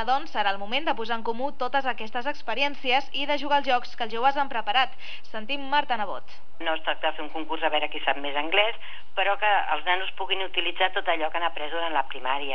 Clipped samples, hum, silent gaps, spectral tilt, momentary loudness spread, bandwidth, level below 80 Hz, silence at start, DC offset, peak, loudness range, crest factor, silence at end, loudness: under 0.1%; none; none; -4 dB/octave; 8 LU; 5.4 kHz; -64 dBFS; 0 s; 5%; -8 dBFS; 3 LU; 20 dB; 0 s; -26 LUFS